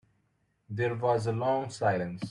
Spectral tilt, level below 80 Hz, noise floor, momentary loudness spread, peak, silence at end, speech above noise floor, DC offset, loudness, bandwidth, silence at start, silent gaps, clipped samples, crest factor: -6.5 dB/octave; -68 dBFS; -73 dBFS; 5 LU; -14 dBFS; 0 s; 44 dB; under 0.1%; -30 LUFS; 11 kHz; 0.7 s; none; under 0.1%; 16 dB